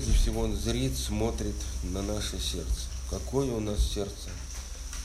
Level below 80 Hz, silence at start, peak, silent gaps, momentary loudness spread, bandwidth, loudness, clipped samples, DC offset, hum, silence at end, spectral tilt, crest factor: -32 dBFS; 0 s; -14 dBFS; none; 10 LU; 15 kHz; -32 LUFS; under 0.1%; under 0.1%; none; 0 s; -5 dB/octave; 16 dB